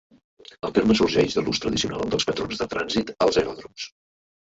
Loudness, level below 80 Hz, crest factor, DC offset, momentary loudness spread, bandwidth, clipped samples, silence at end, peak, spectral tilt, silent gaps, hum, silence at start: -23 LUFS; -50 dBFS; 18 dB; under 0.1%; 15 LU; 8 kHz; under 0.1%; 0.7 s; -6 dBFS; -4.5 dB/octave; none; none; 0.65 s